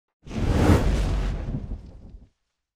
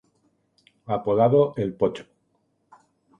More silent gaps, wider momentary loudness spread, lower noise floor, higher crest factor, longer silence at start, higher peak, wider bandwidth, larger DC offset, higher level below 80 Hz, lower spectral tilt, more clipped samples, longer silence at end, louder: neither; first, 17 LU vs 11 LU; about the same, -68 dBFS vs -70 dBFS; about the same, 20 dB vs 20 dB; second, 0.25 s vs 0.9 s; about the same, -4 dBFS vs -6 dBFS; first, 15.5 kHz vs 7.8 kHz; neither; first, -28 dBFS vs -60 dBFS; second, -7 dB/octave vs -9 dB/octave; neither; second, 0.55 s vs 1.15 s; about the same, -24 LUFS vs -22 LUFS